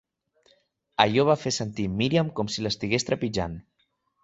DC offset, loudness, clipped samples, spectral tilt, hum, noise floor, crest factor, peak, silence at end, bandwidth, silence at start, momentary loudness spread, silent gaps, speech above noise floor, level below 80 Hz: under 0.1%; -25 LUFS; under 0.1%; -5 dB/octave; none; -72 dBFS; 24 dB; -2 dBFS; 0.65 s; 8.2 kHz; 1 s; 10 LU; none; 47 dB; -52 dBFS